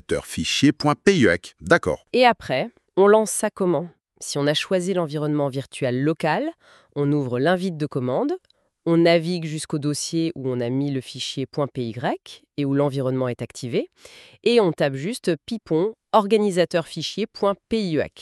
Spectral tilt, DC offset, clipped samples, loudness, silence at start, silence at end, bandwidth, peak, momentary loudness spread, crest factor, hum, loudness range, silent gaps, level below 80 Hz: -5 dB/octave; under 0.1%; under 0.1%; -22 LUFS; 0.1 s; 0 s; 13 kHz; -4 dBFS; 10 LU; 18 dB; none; 6 LU; none; -58 dBFS